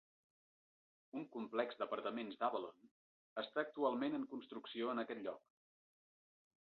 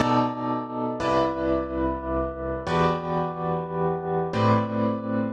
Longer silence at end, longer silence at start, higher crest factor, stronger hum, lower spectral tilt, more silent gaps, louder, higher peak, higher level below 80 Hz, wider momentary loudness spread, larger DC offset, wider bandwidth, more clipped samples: first, 1.25 s vs 0 s; first, 1.15 s vs 0 s; first, 22 dB vs 16 dB; neither; second, -2.5 dB/octave vs -7.5 dB/octave; first, 2.91-3.36 s vs none; second, -44 LUFS vs -26 LUFS; second, -24 dBFS vs -8 dBFS; second, under -90 dBFS vs -42 dBFS; first, 11 LU vs 6 LU; neither; second, 5.6 kHz vs 9 kHz; neither